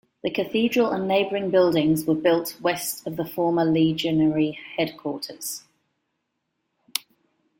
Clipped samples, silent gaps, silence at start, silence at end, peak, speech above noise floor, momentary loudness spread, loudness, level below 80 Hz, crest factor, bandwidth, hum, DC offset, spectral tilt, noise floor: under 0.1%; none; 0.25 s; 0.6 s; -2 dBFS; 55 dB; 11 LU; -23 LUFS; -62 dBFS; 22 dB; 17 kHz; none; under 0.1%; -5 dB/octave; -77 dBFS